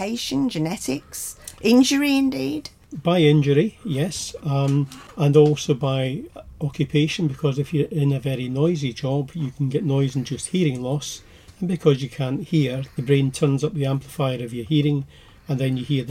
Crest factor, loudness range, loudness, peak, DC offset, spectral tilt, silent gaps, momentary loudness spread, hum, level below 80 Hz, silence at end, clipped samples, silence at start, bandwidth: 18 dB; 4 LU; -22 LUFS; -4 dBFS; under 0.1%; -6 dB/octave; none; 12 LU; none; -52 dBFS; 0 s; under 0.1%; 0 s; 15.5 kHz